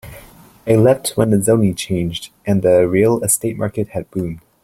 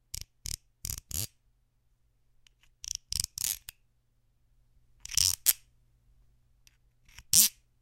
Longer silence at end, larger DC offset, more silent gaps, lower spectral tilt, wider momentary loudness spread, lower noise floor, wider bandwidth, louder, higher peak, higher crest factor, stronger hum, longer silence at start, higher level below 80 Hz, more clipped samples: about the same, 0.25 s vs 0.3 s; neither; neither; first, -5.5 dB/octave vs 0.5 dB/octave; second, 12 LU vs 19 LU; second, -43 dBFS vs -70 dBFS; about the same, 16.5 kHz vs 17 kHz; first, -16 LUFS vs -28 LUFS; about the same, -2 dBFS vs 0 dBFS; second, 16 dB vs 36 dB; neither; about the same, 0.05 s vs 0.15 s; first, -46 dBFS vs -54 dBFS; neither